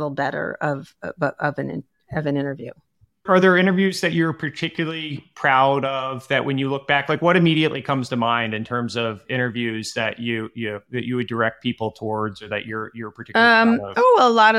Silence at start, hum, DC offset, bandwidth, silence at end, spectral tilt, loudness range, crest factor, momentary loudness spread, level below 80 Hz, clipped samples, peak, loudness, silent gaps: 0 s; none; under 0.1%; 13.5 kHz; 0 s; -6 dB/octave; 6 LU; 18 dB; 14 LU; -62 dBFS; under 0.1%; -2 dBFS; -21 LUFS; none